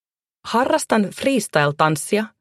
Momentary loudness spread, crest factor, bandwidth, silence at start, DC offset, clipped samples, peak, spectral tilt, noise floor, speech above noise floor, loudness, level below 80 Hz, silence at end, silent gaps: 5 LU; 18 dB; 14 kHz; 0.45 s; under 0.1%; under 0.1%; -2 dBFS; -4.5 dB/octave; -41 dBFS; 22 dB; -19 LUFS; -62 dBFS; 0.15 s; none